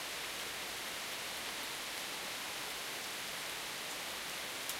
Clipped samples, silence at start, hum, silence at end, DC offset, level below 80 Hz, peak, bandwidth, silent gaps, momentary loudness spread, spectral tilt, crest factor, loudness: under 0.1%; 0 s; none; 0 s; under 0.1%; -70 dBFS; -22 dBFS; 16 kHz; none; 0 LU; 0 dB/octave; 20 dB; -40 LUFS